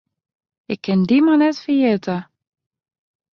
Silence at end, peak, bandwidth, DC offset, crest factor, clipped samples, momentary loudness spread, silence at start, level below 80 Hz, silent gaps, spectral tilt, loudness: 1.1 s; -6 dBFS; 6.8 kHz; under 0.1%; 14 dB; under 0.1%; 13 LU; 0.7 s; -64 dBFS; none; -7.5 dB/octave; -17 LUFS